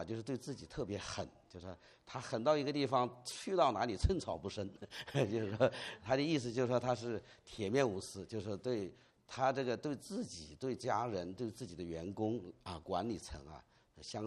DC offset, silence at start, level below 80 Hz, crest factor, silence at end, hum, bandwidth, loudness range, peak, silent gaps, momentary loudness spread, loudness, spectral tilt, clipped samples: under 0.1%; 0 s; -54 dBFS; 22 dB; 0 s; none; 12.5 kHz; 5 LU; -16 dBFS; none; 15 LU; -39 LUFS; -5.5 dB/octave; under 0.1%